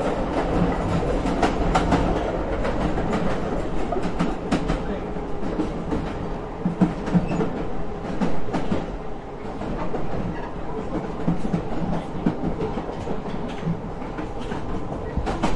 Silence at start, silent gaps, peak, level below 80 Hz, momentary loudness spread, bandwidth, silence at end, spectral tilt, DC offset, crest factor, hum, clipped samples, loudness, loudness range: 0 s; none; -6 dBFS; -32 dBFS; 9 LU; 11 kHz; 0 s; -7 dB/octave; under 0.1%; 18 dB; none; under 0.1%; -26 LUFS; 5 LU